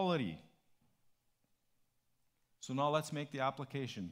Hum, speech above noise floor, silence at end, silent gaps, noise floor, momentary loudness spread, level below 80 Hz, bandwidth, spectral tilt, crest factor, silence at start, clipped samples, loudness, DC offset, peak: none; 40 dB; 0 s; none; -79 dBFS; 11 LU; -78 dBFS; 16 kHz; -5.5 dB/octave; 22 dB; 0 s; under 0.1%; -39 LUFS; under 0.1%; -20 dBFS